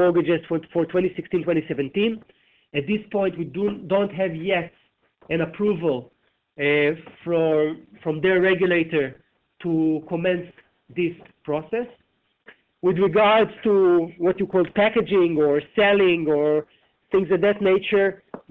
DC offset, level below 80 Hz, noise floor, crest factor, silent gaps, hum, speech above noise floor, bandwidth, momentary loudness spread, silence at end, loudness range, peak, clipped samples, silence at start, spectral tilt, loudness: under 0.1%; -58 dBFS; -54 dBFS; 14 dB; none; none; 33 dB; 4.2 kHz; 10 LU; 0.1 s; 6 LU; -8 dBFS; under 0.1%; 0 s; -9 dB/octave; -22 LUFS